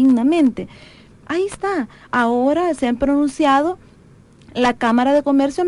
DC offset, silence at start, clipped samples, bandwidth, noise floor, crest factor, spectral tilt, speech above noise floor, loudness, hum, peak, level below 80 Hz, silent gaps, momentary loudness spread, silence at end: under 0.1%; 0 s; under 0.1%; 11.5 kHz; -47 dBFS; 14 dB; -5 dB/octave; 30 dB; -18 LUFS; none; -4 dBFS; -48 dBFS; none; 10 LU; 0 s